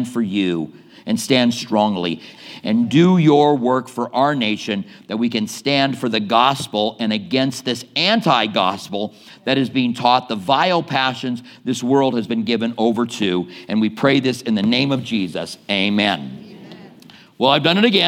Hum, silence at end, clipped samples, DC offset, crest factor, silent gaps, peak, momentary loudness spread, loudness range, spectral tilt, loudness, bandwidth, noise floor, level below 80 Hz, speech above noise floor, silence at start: none; 0 s; under 0.1%; under 0.1%; 18 dB; none; 0 dBFS; 12 LU; 2 LU; -5 dB/octave; -18 LUFS; 16 kHz; -45 dBFS; -68 dBFS; 27 dB; 0 s